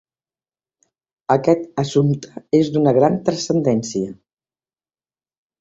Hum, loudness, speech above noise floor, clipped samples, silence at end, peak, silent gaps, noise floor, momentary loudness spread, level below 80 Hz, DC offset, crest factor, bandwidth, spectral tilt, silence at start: none; -18 LUFS; over 73 dB; under 0.1%; 1.45 s; -2 dBFS; none; under -90 dBFS; 10 LU; -58 dBFS; under 0.1%; 18 dB; 8 kHz; -6.5 dB/octave; 1.3 s